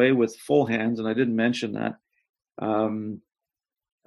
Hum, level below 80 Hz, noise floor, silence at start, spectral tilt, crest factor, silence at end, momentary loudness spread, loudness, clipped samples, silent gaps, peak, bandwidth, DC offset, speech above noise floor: none; -68 dBFS; -90 dBFS; 0 s; -6.5 dB/octave; 18 dB; 0.9 s; 11 LU; -25 LUFS; under 0.1%; 2.29-2.34 s; -8 dBFS; 12 kHz; under 0.1%; 66 dB